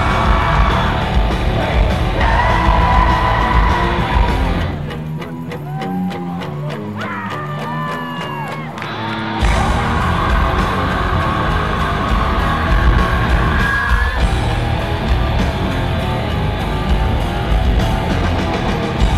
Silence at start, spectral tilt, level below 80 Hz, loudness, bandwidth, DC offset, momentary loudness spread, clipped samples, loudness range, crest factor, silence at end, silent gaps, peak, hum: 0 s; -6.5 dB/octave; -20 dBFS; -17 LUFS; 13 kHz; 0.7%; 9 LU; under 0.1%; 8 LU; 16 dB; 0 s; none; 0 dBFS; none